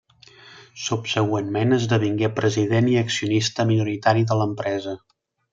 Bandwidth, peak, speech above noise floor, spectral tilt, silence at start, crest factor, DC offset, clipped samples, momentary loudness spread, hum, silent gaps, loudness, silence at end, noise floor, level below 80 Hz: 7.6 kHz; -4 dBFS; 28 dB; -5.5 dB/octave; 0.45 s; 18 dB; under 0.1%; under 0.1%; 8 LU; none; none; -22 LUFS; 0.55 s; -49 dBFS; -62 dBFS